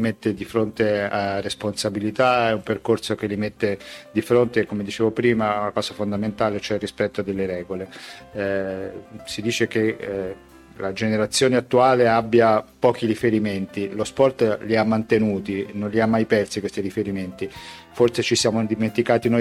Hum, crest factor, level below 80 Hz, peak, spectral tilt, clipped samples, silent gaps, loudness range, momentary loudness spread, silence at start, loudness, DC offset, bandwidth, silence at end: none; 18 dB; -54 dBFS; -4 dBFS; -5 dB/octave; under 0.1%; none; 7 LU; 11 LU; 0 s; -22 LUFS; under 0.1%; 14 kHz; 0 s